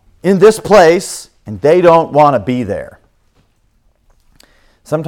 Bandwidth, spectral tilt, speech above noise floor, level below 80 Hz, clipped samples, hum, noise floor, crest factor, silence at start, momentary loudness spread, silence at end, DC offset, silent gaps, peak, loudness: 17 kHz; -5.5 dB/octave; 46 dB; -46 dBFS; 0.8%; none; -55 dBFS; 12 dB; 0.25 s; 16 LU; 0 s; under 0.1%; none; 0 dBFS; -10 LUFS